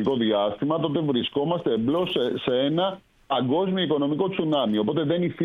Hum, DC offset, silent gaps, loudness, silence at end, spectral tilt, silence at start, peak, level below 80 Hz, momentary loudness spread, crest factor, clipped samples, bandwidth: none; under 0.1%; none; -24 LUFS; 0 s; -8.5 dB/octave; 0 s; -10 dBFS; -60 dBFS; 3 LU; 14 dB; under 0.1%; 6.2 kHz